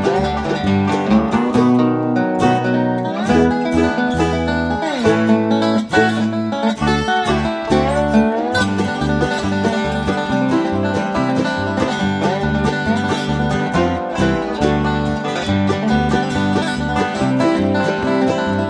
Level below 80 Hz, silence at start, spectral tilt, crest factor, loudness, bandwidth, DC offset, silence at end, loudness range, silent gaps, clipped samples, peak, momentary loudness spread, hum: -34 dBFS; 0 s; -6.5 dB/octave; 14 dB; -17 LUFS; 10.5 kHz; under 0.1%; 0 s; 2 LU; none; under 0.1%; -2 dBFS; 4 LU; none